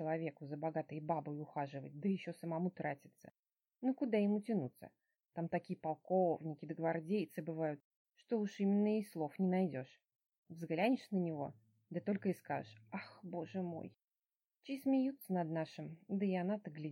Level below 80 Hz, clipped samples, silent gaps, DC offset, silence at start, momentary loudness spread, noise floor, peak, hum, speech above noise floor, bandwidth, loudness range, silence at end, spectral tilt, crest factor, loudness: -90 dBFS; under 0.1%; 3.39-3.43 s, 7.84-8.05 s, 10.38-10.43 s, 14.36-14.40 s; under 0.1%; 0 s; 13 LU; under -90 dBFS; -22 dBFS; none; over 51 dB; 16 kHz; 4 LU; 0 s; -8.5 dB/octave; 18 dB; -40 LUFS